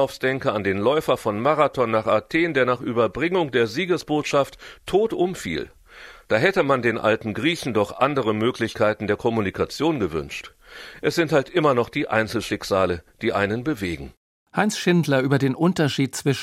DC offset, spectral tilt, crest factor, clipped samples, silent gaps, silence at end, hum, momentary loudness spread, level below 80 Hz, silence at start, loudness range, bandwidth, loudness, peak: under 0.1%; -5.5 dB/octave; 20 dB; under 0.1%; 14.17-14.46 s; 0 s; none; 8 LU; -52 dBFS; 0 s; 2 LU; 16 kHz; -22 LUFS; -2 dBFS